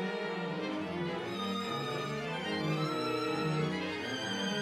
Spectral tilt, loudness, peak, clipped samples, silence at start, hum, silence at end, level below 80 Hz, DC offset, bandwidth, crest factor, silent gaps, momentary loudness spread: -5 dB/octave; -35 LUFS; -22 dBFS; under 0.1%; 0 s; none; 0 s; -70 dBFS; under 0.1%; 15.5 kHz; 14 dB; none; 4 LU